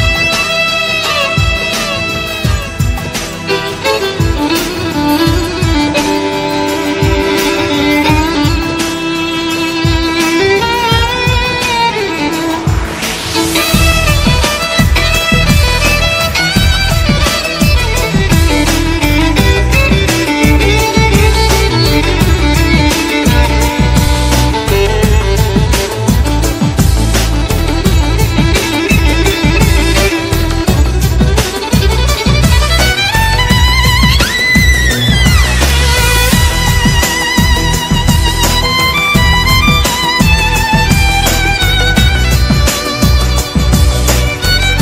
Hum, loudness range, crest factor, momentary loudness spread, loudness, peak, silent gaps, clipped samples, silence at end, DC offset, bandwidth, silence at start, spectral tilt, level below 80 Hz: none; 3 LU; 10 dB; 5 LU; -10 LUFS; 0 dBFS; none; 0.5%; 0 s; under 0.1%; 16.5 kHz; 0 s; -4 dB/octave; -16 dBFS